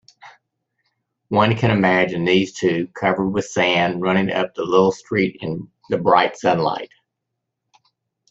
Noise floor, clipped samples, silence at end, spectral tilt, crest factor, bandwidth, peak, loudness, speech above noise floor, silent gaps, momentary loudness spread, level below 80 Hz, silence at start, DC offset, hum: -79 dBFS; under 0.1%; 1.45 s; -6 dB/octave; 20 dB; 8 kHz; 0 dBFS; -19 LUFS; 61 dB; none; 8 LU; -56 dBFS; 0.25 s; under 0.1%; none